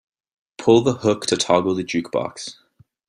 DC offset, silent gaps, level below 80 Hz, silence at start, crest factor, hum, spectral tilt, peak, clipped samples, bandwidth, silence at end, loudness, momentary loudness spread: under 0.1%; none; -60 dBFS; 0.6 s; 18 dB; none; -4.5 dB/octave; -2 dBFS; under 0.1%; 11 kHz; 0.55 s; -20 LUFS; 14 LU